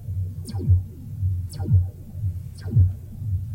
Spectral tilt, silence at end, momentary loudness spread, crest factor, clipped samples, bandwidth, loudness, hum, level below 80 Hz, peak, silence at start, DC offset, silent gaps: -8.5 dB/octave; 0 s; 10 LU; 14 dB; under 0.1%; 10.5 kHz; -25 LUFS; none; -40 dBFS; -8 dBFS; 0 s; under 0.1%; none